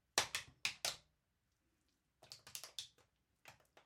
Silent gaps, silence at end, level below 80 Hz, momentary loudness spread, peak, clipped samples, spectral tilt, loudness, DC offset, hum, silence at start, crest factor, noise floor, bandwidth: none; 0.05 s; -80 dBFS; 25 LU; -14 dBFS; under 0.1%; 0.5 dB/octave; -43 LUFS; under 0.1%; none; 0.15 s; 36 dB; -84 dBFS; 16 kHz